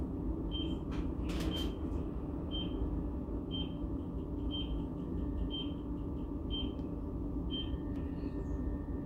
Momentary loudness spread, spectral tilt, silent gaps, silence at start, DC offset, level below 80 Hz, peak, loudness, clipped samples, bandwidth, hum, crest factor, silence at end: 3 LU; -7.5 dB/octave; none; 0 s; under 0.1%; -42 dBFS; -24 dBFS; -39 LUFS; under 0.1%; 14 kHz; none; 14 dB; 0 s